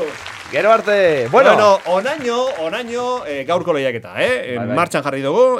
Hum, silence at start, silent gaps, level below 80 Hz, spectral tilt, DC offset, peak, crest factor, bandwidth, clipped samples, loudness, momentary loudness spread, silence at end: none; 0 s; none; -60 dBFS; -4.5 dB/octave; under 0.1%; 0 dBFS; 16 dB; 14 kHz; under 0.1%; -16 LUFS; 10 LU; 0 s